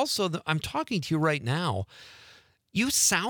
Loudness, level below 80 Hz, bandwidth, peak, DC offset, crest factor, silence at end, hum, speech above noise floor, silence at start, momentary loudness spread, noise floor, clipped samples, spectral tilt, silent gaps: -27 LUFS; -60 dBFS; 19.5 kHz; -10 dBFS; under 0.1%; 20 dB; 0 s; none; 29 dB; 0 s; 15 LU; -57 dBFS; under 0.1%; -3 dB/octave; none